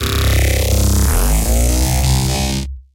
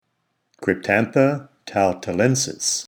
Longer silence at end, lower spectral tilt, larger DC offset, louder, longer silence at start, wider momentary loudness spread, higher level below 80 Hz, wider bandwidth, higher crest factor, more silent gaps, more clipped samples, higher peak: about the same, 0.15 s vs 0.05 s; about the same, -4.5 dB/octave vs -4 dB/octave; neither; first, -15 LUFS vs -21 LUFS; second, 0 s vs 0.6 s; second, 3 LU vs 8 LU; first, -16 dBFS vs -60 dBFS; second, 17.5 kHz vs over 20 kHz; second, 12 dB vs 20 dB; neither; neither; about the same, -2 dBFS vs -2 dBFS